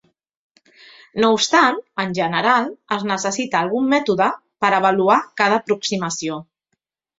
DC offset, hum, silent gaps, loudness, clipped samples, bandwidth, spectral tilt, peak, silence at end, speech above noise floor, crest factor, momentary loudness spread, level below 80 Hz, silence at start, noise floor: under 0.1%; none; none; -18 LUFS; under 0.1%; 8 kHz; -3.5 dB/octave; -2 dBFS; 0.75 s; 57 dB; 18 dB; 9 LU; -64 dBFS; 1.15 s; -75 dBFS